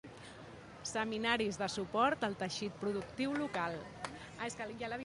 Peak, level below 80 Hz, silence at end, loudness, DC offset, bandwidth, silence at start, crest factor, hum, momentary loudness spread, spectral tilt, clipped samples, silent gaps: -18 dBFS; -66 dBFS; 0 s; -37 LUFS; under 0.1%; 11.5 kHz; 0.05 s; 22 dB; none; 15 LU; -4 dB/octave; under 0.1%; none